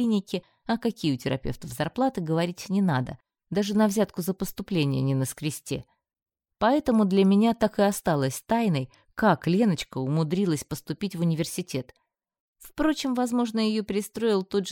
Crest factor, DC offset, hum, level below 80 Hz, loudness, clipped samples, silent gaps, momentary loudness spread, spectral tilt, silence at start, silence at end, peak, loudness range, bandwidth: 18 dB; under 0.1%; none; -54 dBFS; -26 LUFS; under 0.1%; 6.22-6.26 s, 12.40-12.53 s; 10 LU; -6 dB/octave; 0 s; 0 s; -8 dBFS; 5 LU; 17.5 kHz